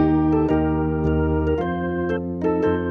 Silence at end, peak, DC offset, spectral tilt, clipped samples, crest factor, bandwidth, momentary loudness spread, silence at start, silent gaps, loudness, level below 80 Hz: 0 s; -8 dBFS; under 0.1%; -10 dB/octave; under 0.1%; 12 dB; 4.7 kHz; 5 LU; 0 s; none; -21 LUFS; -34 dBFS